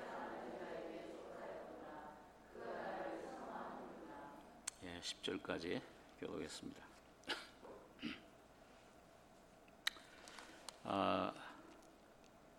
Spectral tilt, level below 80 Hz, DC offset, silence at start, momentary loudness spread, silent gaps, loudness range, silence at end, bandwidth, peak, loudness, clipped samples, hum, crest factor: -3.5 dB/octave; -76 dBFS; under 0.1%; 0 s; 20 LU; none; 6 LU; 0 s; 17 kHz; -18 dBFS; -48 LUFS; under 0.1%; none; 32 dB